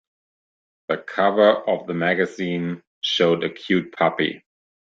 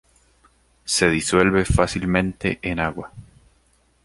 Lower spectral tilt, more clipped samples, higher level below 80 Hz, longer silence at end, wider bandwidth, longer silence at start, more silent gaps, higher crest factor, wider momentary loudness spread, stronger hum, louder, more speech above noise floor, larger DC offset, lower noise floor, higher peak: about the same, -5.5 dB/octave vs -4.5 dB/octave; neither; second, -66 dBFS vs -36 dBFS; second, 0.45 s vs 0.8 s; second, 7.6 kHz vs 11.5 kHz; about the same, 0.9 s vs 0.85 s; first, 2.87-3.01 s vs none; about the same, 20 dB vs 22 dB; second, 11 LU vs 14 LU; neither; about the same, -21 LUFS vs -20 LUFS; first, over 69 dB vs 41 dB; neither; first, under -90 dBFS vs -61 dBFS; about the same, -2 dBFS vs 0 dBFS